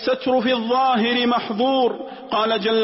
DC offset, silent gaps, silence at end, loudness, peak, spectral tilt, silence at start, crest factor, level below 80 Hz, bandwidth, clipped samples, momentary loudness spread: under 0.1%; none; 0 s; -20 LUFS; -10 dBFS; -8 dB/octave; 0 s; 10 dB; -62 dBFS; 5.8 kHz; under 0.1%; 5 LU